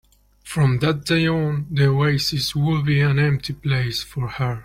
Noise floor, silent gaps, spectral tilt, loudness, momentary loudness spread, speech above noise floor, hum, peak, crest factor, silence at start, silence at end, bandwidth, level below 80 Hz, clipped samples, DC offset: -42 dBFS; none; -6 dB/octave; -20 LUFS; 7 LU; 22 dB; none; -6 dBFS; 14 dB; 0.45 s; 0 s; 15.5 kHz; -46 dBFS; under 0.1%; under 0.1%